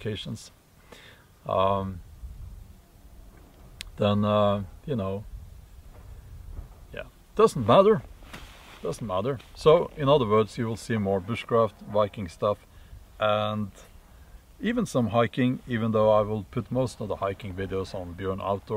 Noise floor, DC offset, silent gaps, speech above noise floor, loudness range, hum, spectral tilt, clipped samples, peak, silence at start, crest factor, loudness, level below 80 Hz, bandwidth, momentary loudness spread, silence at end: -52 dBFS; under 0.1%; none; 27 dB; 7 LU; none; -6.5 dB/octave; under 0.1%; -6 dBFS; 0 s; 22 dB; -26 LUFS; -48 dBFS; 16 kHz; 23 LU; 0 s